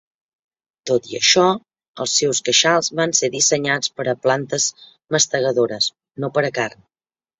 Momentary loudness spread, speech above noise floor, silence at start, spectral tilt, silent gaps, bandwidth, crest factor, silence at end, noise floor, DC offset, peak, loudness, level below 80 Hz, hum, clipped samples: 9 LU; over 71 dB; 0.85 s; -2 dB/octave; 1.88-1.94 s; 8.4 kHz; 20 dB; 0.7 s; under -90 dBFS; under 0.1%; 0 dBFS; -18 LUFS; -64 dBFS; none; under 0.1%